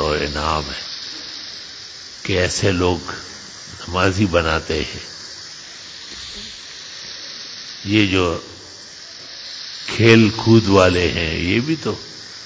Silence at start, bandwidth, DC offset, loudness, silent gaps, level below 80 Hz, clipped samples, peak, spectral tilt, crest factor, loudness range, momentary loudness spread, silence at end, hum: 0 s; 8 kHz; under 0.1%; -18 LUFS; none; -36 dBFS; under 0.1%; 0 dBFS; -5 dB/octave; 20 dB; 8 LU; 19 LU; 0 s; none